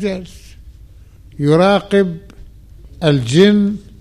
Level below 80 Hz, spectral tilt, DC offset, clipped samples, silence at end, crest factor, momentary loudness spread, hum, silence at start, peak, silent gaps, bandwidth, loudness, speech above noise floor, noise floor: -40 dBFS; -6.5 dB/octave; 0.2%; under 0.1%; 0.2 s; 16 dB; 12 LU; none; 0 s; 0 dBFS; none; 11.5 kHz; -14 LUFS; 27 dB; -41 dBFS